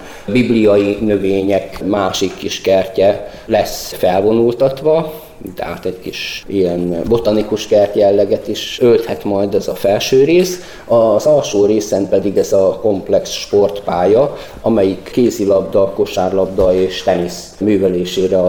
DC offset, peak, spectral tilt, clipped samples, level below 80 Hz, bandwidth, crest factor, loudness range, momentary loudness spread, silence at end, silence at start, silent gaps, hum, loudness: 0.2%; -2 dBFS; -5.5 dB/octave; under 0.1%; -40 dBFS; 19.5 kHz; 10 dB; 3 LU; 8 LU; 0 s; 0 s; none; none; -14 LUFS